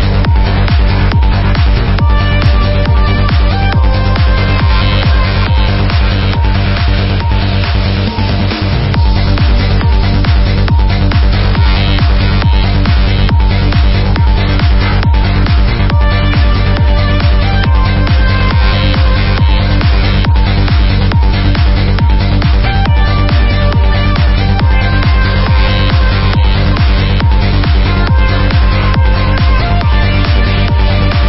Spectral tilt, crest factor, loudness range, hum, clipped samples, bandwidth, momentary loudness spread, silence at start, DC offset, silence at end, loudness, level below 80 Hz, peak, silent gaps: -10 dB/octave; 8 dB; 1 LU; none; under 0.1%; 5.8 kHz; 1 LU; 0 s; 0.7%; 0 s; -11 LUFS; -10 dBFS; 0 dBFS; none